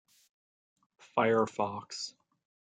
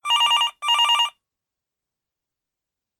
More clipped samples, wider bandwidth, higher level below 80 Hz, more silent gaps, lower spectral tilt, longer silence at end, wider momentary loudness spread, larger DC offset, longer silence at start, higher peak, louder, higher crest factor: neither; second, 9.4 kHz vs 18 kHz; about the same, -80 dBFS vs -84 dBFS; neither; first, -4.5 dB/octave vs 5 dB/octave; second, 0.7 s vs 1.9 s; first, 12 LU vs 4 LU; neither; first, 1.15 s vs 0.05 s; second, -12 dBFS vs -8 dBFS; second, -32 LUFS vs -18 LUFS; first, 22 dB vs 16 dB